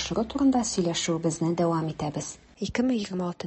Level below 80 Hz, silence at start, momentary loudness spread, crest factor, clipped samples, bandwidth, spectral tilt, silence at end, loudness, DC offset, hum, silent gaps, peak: -52 dBFS; 0 s; 9 LU; 16 dB; under 0.1%; 8.6 kHz; -5 dB/octave; 0 s; -27 LUFS; under 0.1%; none; none; -12 dBFS